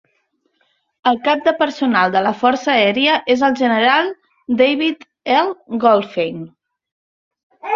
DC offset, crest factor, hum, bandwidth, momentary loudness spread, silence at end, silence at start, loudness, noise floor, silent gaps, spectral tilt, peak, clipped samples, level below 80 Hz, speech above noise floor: under 0.1%; 16 dB; none; 7.4 kHz; 10 LU; 0 s; 1.05 s; -16 LUFS; -66 dBFS; 6.92-7.31 s, 7.43-7.50 s; -5 dB/octave; -2 dBFS; under 0.1%; -62 dBFS; 50 dB